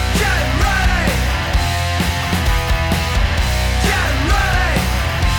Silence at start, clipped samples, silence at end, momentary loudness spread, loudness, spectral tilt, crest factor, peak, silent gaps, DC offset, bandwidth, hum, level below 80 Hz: 0 s; under 0.1%; 0 s; 2 LU; -17 LUFS; -4.5 dB/octave; 10 dB; -6 dBFS; none; under 0.1%; 19 kHz; none; -20 dBFS